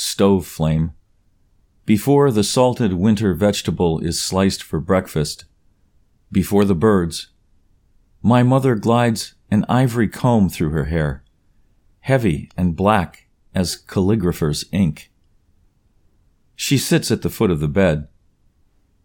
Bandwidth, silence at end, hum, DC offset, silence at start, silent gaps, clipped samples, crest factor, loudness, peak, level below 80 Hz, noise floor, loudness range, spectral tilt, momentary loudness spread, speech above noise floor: 19 kHz; 1 s; none; under 0.1%; 0 s; none; under 0.1%; 18 dB; -18 LUFS; 0 dBFS; -40 dBFS; -59 dBFS; 4 LU; -6 dB/octave; 10 LU; 41 dB